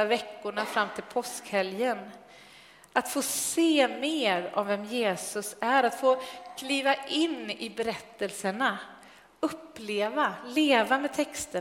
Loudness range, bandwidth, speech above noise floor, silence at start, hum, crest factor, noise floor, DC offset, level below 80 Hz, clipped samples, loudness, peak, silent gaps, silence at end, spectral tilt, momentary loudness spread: 5 LU; 16 kHz; 25 dB; 0 s; none; 20 dB; -54 dBFS; under 0.1%; -72 dBFS; under 0.1%; -28 LUFS; -8 dBFS; none; 0 s; -2.5 dB/octave; 11 LU